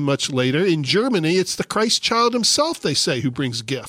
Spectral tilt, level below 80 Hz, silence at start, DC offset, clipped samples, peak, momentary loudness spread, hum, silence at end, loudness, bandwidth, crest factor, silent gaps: -3.5 dB/octave; -58 dBFS; 0 s; under 0.1%; under 0.1%; -4 dBFS; 6 LU; none; 0 s; -19 LUFS; 16 kHz; 16 dB; none